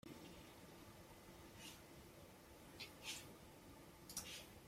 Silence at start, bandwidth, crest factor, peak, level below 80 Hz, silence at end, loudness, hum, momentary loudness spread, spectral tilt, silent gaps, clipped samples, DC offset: 0.05 s; 16 kHz; 28 dB; -30 dBFS; -72 dBFS; 0 s; -56 LUFS; none; 11 LU; -2.5 dB/octave; none; under 0.1%; under 0.1%